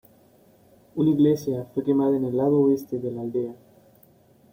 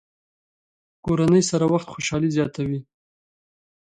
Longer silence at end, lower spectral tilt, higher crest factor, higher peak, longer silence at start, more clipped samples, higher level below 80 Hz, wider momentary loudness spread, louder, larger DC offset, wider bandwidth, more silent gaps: second, 1 s vs 1.15 s; first, -9 dB/octave vs -5.5 dB/octave; about the same, 16 dB vs 18 dB; about the same, -8 dBFS vs -8 dBFS; about the same, 0.95 s vs 1.05 s; neither; second, -64 dBFS vs -52 dBFS; about the same, 10 LU vs 10 LU; about the same, -23 LUFS vs -22 LUFS; neither; first, 16.5 kHz vs 10.5 kHz; neither